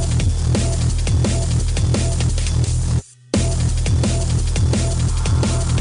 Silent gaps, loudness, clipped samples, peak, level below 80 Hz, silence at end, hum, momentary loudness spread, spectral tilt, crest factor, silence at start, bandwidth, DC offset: none; -19 LUFS; under 0.1%; -6 dBFS; -22 dBFS; 0 s; none; 2 LU; -5.5 dB/octave; 12 dB; 0 s; 11 kHz; under 0.1%